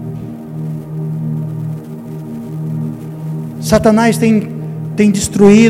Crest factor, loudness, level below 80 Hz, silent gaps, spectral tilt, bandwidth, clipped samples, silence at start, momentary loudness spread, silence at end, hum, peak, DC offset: 14 dB; -15 LUFS; -40 dBFS; none; -6 dB/octave; 15 kHz; 0.3%; 0 s; 16 LU; 0 s; none; 0 dBFS; under 0.1%